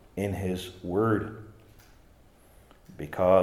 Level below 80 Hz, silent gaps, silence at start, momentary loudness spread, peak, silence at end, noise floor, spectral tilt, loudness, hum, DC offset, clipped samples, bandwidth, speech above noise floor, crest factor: -58 dBFS; none; 0.15 s; 17 LU; -8 dBFS; 0 s; -57 dBFS; -7 dB/octave; -29 LUFS; none; under 0.1%; under 0.1%; 15.5 kHz; 31 dB; 20 dB